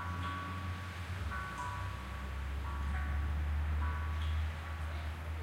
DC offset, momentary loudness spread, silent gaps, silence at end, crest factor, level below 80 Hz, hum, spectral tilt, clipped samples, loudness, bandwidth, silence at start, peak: under 0.1%; 5 LU; none; 0 s; 12 dB; -40 dBFS; none; -6 dB/octave; under 0.1%; -39 LUFS; 13.5 kHz; 0 s; -26 dBFS